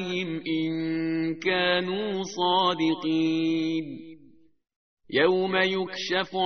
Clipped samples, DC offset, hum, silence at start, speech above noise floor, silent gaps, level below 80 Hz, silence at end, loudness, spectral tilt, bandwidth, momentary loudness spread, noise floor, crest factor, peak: under 0.1%; 0.2%; none; 0 s; 31 dB; 4.76-4.97 s; -66 dBFS; 0 s; -26 LUFS; -3 dB/octave; 6.6 kHz; 7 LU; -57 dBFS; 18 dB; -8 dBFS